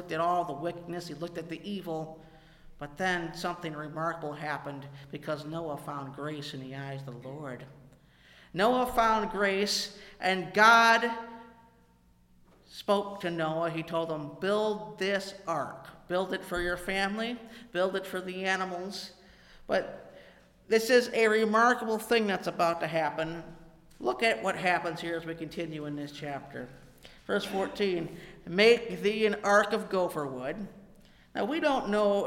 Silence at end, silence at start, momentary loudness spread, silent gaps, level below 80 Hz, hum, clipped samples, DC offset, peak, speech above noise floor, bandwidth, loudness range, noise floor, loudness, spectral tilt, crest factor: 0 s; 0 s; 17 LU; none; -58 dBFS; none; under 0.1%; under 0.1%; -8 dBFS; 33 dB; 16.5 kHz; 10 LU; -63 dBFS; -30 LUFS; -4.5 dB/octave; 24 dB